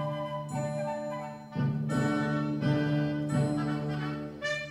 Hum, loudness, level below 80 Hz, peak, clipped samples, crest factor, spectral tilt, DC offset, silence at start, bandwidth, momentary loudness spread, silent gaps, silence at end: none; -31 LUFS; -58 dBFS; -16 dBFS; under 0.1%; 14 dB; -7 dB/octave; under 0.1%; 0 s; 11 kHz; 7 LU; none; 0 s